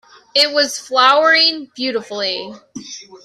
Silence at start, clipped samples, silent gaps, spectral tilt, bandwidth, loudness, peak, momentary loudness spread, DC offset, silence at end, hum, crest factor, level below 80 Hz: 0.35 s; under 0.1%; none; -1 dB/octave; 15 kHz; -14 LUFS; 0 dBFS; 21 LU; under 0.1%; 0.1 s; none; 16 dB; -68 dBFS